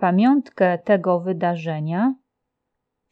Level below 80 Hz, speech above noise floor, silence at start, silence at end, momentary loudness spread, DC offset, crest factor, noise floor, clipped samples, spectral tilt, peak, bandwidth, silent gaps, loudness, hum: -78 dBFS; 59 dB; 0 s; 1 s; 8 LU; under 0.1%; 14 dB; -79 dBFS; under 0.1%; -9.5 dB/octave; -6 dBFS; 6.4 kHz; none; -20 LUFS; none